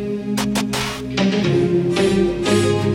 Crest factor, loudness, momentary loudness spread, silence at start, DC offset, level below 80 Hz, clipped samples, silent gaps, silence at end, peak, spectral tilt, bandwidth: 14 dB; -18 LUFS; 5 LU; 0 s; under 0.1%; -40 dBFS; under 0.1%; none; 0 s; -4 dBFS; -5.5 dB/octave; 16.5 kHz